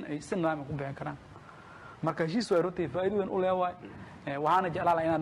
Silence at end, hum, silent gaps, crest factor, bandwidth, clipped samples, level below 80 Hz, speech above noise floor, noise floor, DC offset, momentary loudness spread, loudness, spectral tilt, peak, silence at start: 0 s; none; none; 14 dB; 12.5 kHz; under 0.1%; -62 dBFS; 20 dB; -50 dBFS; under 0.1%; 20 LU; -31 LUFS; -6.5 dB/octave; -16 dBFS; 0 s